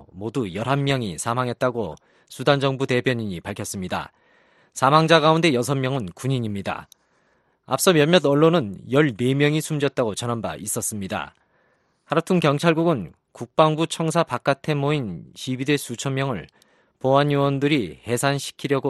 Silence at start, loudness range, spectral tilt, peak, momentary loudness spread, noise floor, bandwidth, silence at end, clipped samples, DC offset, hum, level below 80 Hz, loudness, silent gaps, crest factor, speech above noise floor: 0 s; 4 LU; -5 dB/octave; 0 dBFS; 13 LU; -65 dBFS; 12.5 kHz; 0 s; under 0.1%; under 0.1%; none; -58 dBFS; -22 LUFS; none; 22 dB; 43 dB